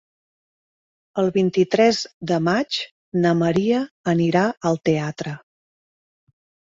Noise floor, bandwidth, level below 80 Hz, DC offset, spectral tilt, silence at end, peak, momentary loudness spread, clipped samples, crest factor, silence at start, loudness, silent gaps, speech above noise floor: under -90 dBFS; 7.8 kHz; -60 dBFS; under 0.1%; -6 dB/octave; 1.3 s; -4 dBFS; 10 LU; under 0.1%; 18 dB; 1.15 s; -21 LUFS; 2.14-2.21 s, 2.91-3.12 s, 3.91-4.04 s; over 70 dB